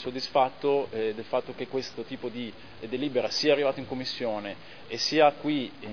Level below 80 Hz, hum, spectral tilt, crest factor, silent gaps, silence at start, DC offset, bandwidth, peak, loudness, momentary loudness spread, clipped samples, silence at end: -66 dBFS; none; -4 dB/octave; 22 dB; none; 0 s; 0.4%; 5.4 kHz; -8 dBFS; -28 LUFS; 14 LU; under 0.1%; 0 s